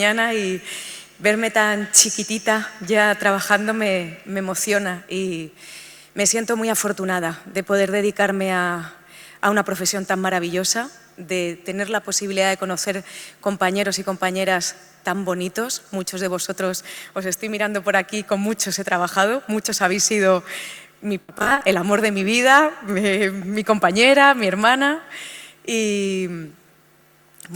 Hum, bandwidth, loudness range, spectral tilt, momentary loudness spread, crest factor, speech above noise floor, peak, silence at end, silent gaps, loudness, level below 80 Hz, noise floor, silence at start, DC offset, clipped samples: none; over 20 kHz; 6 LU; -3 dB/octave; 14 LU; 20 dB; 34 dB; 0 dBFS; 0 s; none; -20 LUFS; -62 dBFS; -54 dBFS; 0 s; under 0.1%; under 0.1%